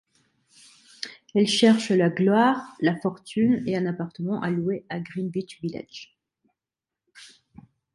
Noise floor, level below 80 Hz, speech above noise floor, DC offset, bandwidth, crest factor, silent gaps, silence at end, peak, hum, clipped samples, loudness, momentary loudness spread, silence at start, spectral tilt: -89 dBFS; -66 dBFS; 66 dB; under 0.1%; 11.5 kHz; 20 dB; none; 0.7 s; -6 dBFS; none; under 0.1%; -24 LUFS; 18 LU; 1 s; -5.5 dB/octave